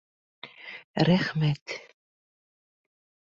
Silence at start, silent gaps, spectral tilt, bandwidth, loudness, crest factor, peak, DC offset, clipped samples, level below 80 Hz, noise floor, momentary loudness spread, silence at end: 0.45 s; 0.84-0.94 s, 1.62-1.66 s; -7 dB/octave; 7.4 kHz; -26 LUFS; 22 dB; -8 dBFS; under 0.1%; under 0.1%; -62 dBFS; under -90 dBFS; 22 LU; 1.45 s